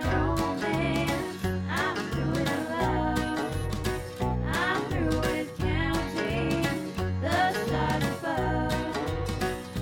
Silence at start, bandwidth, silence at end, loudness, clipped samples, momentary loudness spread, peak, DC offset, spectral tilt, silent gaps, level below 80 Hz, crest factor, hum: 0 s; 18 kHz; 0 s; -28 LUFS; under 0.1%; 5 LU; -14 dBFS; under 0.1%; -5.5 dB/octave; none; -40 dBFS; 14 dB; none